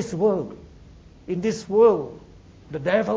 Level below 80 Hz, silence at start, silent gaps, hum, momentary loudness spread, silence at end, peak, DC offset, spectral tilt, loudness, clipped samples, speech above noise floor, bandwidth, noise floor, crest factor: -52 dBFS; 0 s; none; none; 19 LU; 0 s; -4 dBFS; under 0.1%; -6.5 dB/octave; -22 LUFS; under 0.1%; 26 dB; 8 kHz; -47 dBFS; 18 dB